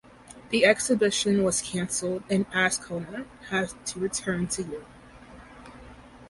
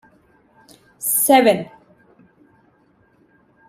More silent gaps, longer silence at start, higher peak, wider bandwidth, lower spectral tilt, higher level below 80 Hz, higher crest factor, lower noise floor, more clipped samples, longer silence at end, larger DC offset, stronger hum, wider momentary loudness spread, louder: neither; second, 0.3 s vs 1 s; second, -6 dBFS vs -2 dBFS; second, 11.5 kHz vs 16 kHz; about the same, -3.5 dB/octave vs -3 dB/octave; first, -56 dBFS vs -66 dBFS; about the same, 22 dB vs 20 dB; second, -48 dBFS vs -58 dBFS; neither; second, 0 s vs 2.05 s; neither; neither; first, 17 LU vs 14 LU; second, -26 LUFS vs -16 LUFS